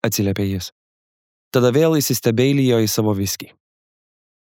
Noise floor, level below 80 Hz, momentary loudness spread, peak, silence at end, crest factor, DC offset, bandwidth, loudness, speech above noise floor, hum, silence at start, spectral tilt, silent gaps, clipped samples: under -90 dBFS; -58 dBFS; 10 LU; -2 dBFS; 1.05 s; 18 dB; under 0.1%; over 20 kHz; -18 LUFS; over 72 dB; none; 0.05 s; -5 dB/octave; 0.72-1.51 s; under 0.1%